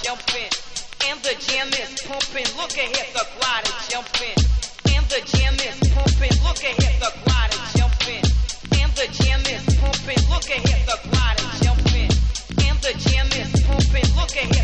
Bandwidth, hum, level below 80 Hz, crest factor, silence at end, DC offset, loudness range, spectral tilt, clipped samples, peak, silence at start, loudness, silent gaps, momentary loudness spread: 9.6 kHz; none; -22 dBFS; 14 dB; 0 s; under 0.1%; 3 LU; -4 dB/octave; under 0.1%; -4 dBFS; 0 s; -20 LUFS; none; 5 LU